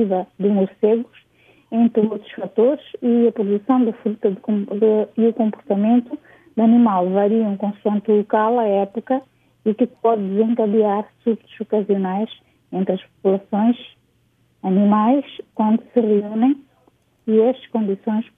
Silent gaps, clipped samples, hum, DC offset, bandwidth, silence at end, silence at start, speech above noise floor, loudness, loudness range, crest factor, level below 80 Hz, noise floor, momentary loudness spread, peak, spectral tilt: none; under 0.1%; none; under 0.1%; 3.8 kHz; 0.15 s; 0 s; 43 dB; -19 LUFS; 3 LU; 16 dB; -70 dBFS; -61 dBFS; 8 LU; -4 dBFS; -10.5 dB/octave